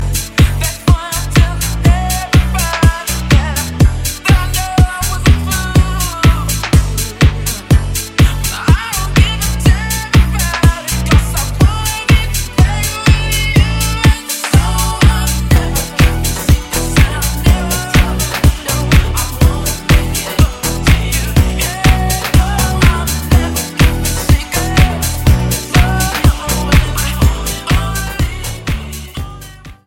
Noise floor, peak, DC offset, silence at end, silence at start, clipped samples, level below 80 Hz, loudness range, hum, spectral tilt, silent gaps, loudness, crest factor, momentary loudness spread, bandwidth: -33 dBFS; 0 dBFS; under 0.1%; 0.15 s; 0 s; under 0.1%; -16 dBFS; 1 LU; none; -4.5 dB/octave; none; -13 LUFS; 12 dB; 5 LU; 17 kHz